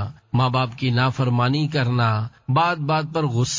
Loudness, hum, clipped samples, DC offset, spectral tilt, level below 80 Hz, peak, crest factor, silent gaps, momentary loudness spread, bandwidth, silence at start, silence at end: -21 LUFS; none; under 0.1%; under 0.1%; -5.5 dB/octave; -52 dBFS; -6 dBFS; 14 dB; none; 3 LU; 7.6 kHz; 0 s; 0 s